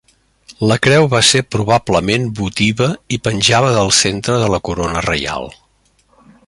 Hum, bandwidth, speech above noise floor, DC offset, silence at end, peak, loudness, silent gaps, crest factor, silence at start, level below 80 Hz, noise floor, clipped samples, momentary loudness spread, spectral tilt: none; 11.5 kHz; 42 dB; under 0.1%; 0.95 s; 0 dBFS; -14 LUFS; none; 16 dB; 0.5 s; -38 dBFS; -56 dBFS; under 0.1%; 8 LU; -4 dB/octave